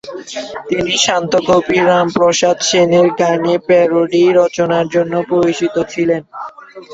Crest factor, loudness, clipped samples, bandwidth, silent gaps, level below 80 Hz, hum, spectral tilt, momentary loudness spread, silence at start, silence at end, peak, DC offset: 12 dB; -13 LUFS; under 0.1%; 8 kHz; none; -50 dBFS; none; -4 dB/octave; 12 LU; 0.05 s; 0 s; 0 dBFS; under 0.1%